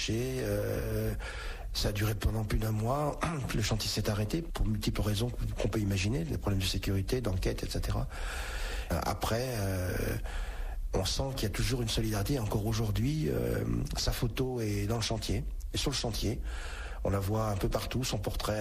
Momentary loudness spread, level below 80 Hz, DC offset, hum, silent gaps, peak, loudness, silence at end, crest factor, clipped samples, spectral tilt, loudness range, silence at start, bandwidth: 6 LU; -38 dBFS; under 0.1%; none; none; -18 dBFS; -33 LUFS; 0 s; 14 dB; under 0.1%; -5 dB/octave; 2 LU; 0 s; 15 kHz